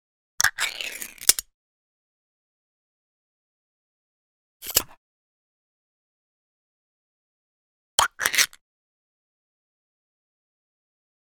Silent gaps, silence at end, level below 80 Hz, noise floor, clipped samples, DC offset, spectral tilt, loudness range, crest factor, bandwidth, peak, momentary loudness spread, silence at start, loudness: 1.54-4.60 s, 4.97-7.98 s; 2.8 s; -60 dBFS; under -90 dBFS; under 0.1%; under 0.1%; 1.5 dB/octave; 6 LU; 32 dB; 19.5 kHz; 0 dBFS; 12 LU; 0.4 s; -23 LUFS